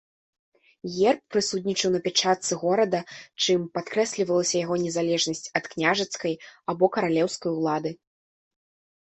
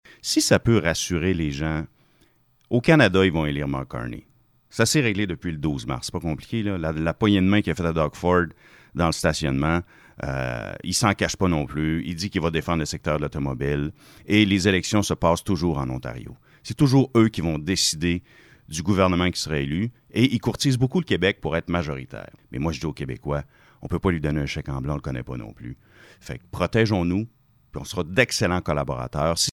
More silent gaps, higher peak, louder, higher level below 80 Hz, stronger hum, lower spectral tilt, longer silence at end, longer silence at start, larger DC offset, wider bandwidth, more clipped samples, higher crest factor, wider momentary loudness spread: neither; second, -6 dBFS vs -2 dBFS; about the same, -25 LUFS vs -23 LUFS; second, -68 dBFS vs -42 dBFS; neither; second, -3.5 dB/octave vs -5 dB/octave; first, 1.1 s vs 0 s; first, 0.85 s vs 0.25 s; neither; second, 8.4 kHz vs 19 kHz; neither; about the same, 20 dB vs 22 dB; second, 8 LU vs 14 LU